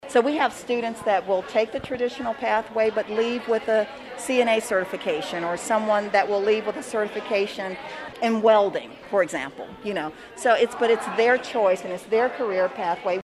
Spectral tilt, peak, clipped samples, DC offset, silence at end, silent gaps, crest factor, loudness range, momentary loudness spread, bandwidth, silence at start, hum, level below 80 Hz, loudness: -4 dB/octave; -6 dBFS; under 0.1%; under 0.1%; 0 s; none; 18 dB; 2 LU; 9 LU; 13 kHz; 0.05 s; none; -62 dBFS; -24 LUFS